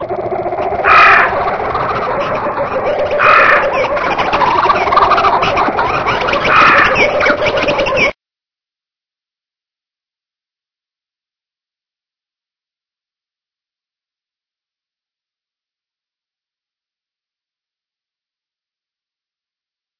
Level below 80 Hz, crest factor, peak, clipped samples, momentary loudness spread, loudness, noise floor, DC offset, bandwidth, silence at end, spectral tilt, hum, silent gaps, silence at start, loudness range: -40 dBFS; 16 dB; 0 dBFS; 0.1%; 10 LU; -11 LUFS; under -90 dBFS; under 0.1%; 5.4 kHz; 11.85 s; -4.5 dB/octave; none; none; 0 s; 7 LU